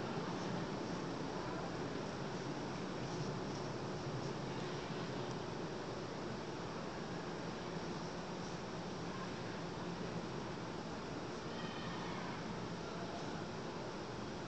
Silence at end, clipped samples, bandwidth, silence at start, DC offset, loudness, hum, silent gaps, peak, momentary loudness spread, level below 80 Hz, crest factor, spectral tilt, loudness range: 0 s; under 0.1%; 8.8 kHz; 0 s; 0.1%; -44 LUFS; none; none; -28 dBFS; 3 LU; -64 dBFS; 14 dB; -5.5 dB/octave; 2 LU